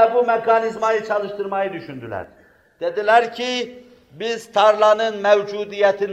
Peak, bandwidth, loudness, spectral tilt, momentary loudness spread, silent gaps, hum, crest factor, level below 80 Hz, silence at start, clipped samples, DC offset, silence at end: -2 dBFS; 10 kHz; -19 LUFS; -4 dB/octave; 15 LU; none; none; 18 dB; -64 dBFS; 0 s; under 0.1%; under 0.1%; 0 s